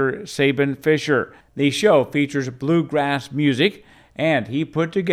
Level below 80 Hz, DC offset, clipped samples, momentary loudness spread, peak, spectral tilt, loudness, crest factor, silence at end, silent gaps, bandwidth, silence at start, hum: -60 dBFS; under 0.1%; under 0.1%; 7 LU; -4 dBFS; -6 dB/octave; -20 LUFS; 16 dB; 0 s; none; 14.5 kHz; 0 s; none